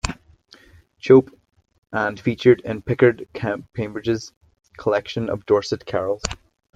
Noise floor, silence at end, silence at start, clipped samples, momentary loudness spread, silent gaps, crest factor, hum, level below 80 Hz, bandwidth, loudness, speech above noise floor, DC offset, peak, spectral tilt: -52 dBFS; 0.4 s; 0.05 s; under 0.1%; 15 LU; 1.78-1.82 s, 4.37-4.41 s; 20 dB; none; -46 dBFS; 9.2 kHz; -21 LUFS; 32 dB; under 0.1%; -2 dBFS; -6 dB/octave